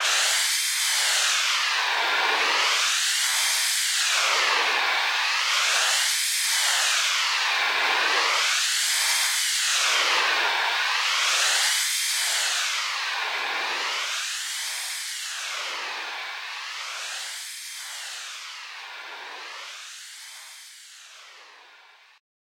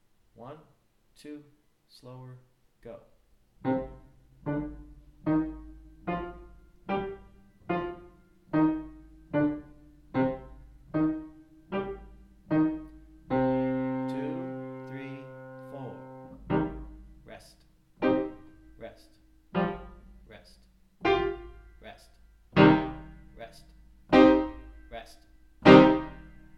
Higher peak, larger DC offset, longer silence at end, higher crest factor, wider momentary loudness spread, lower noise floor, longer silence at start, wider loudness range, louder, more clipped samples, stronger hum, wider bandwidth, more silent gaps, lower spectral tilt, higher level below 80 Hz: second, -10 dBFS vs -2 dBFS; neither; first, 1 s vs 0.4 s; second, 16 dB vs 28 dB; second, 16 LU vs 27 LU; second, -53 dBFS vs -61 dBFS; second, 0 s vs 0.4 s; about the same, 15 LU vs 13 LU; first, -22 LUFS vs -27 LUFS; neither; neither; first, 16.5 kHz vs 7.2 kHz; neither; second, 5 dB/octave vs -8 dB/octave; second, -86 dBFS vs -52 dBFS